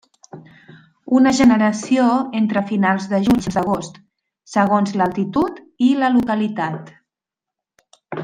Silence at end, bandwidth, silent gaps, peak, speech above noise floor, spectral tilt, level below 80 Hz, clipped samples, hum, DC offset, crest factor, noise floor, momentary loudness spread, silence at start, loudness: 0 s; 9.6 kHz; none; -2 dBFS; 69 dB; -6 dB/octave; -52 dBFS; under 0.1%; none; under 0.1%; 16 dB; -86 dBFS; 10 LU; 0.35 s; -18 LUFS